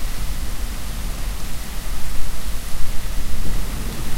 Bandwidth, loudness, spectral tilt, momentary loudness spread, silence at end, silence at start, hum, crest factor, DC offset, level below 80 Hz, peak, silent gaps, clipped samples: 16 kHz; -30 LUFS; -4 dB/octave; 2 LU; 0 s; 0 s; none; 12 dB; under 0.1%; -24 dBFS; -2 dBFS; none; under 0.1%